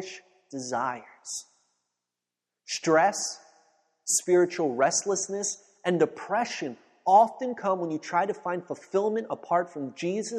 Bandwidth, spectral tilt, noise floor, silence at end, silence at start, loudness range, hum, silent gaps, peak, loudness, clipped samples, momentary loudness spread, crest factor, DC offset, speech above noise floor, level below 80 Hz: 12.5 kHz; -3.5 dB/octave; -88 dBFS; 0 s; 0 s; 4 LU; 60 Hz at -60 dBFS; none; -8 dBFS; -27 LUFS; under 0.1%; 15 LU; 20 dB; under 0.1%; 61 dB; -78 dBFS